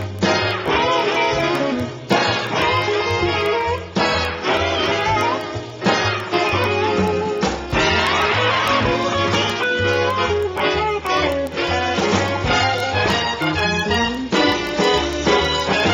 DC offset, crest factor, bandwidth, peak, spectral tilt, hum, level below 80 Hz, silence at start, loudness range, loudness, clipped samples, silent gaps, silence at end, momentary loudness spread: under 0.1%; 18 dB; 16.5 kHz; -2 dBFS; -4.5 dB/octave; none; -38 dBFS; 0 s; 1 LU; -18 LUFS; under 0.1%; none; 0 s; 4 LU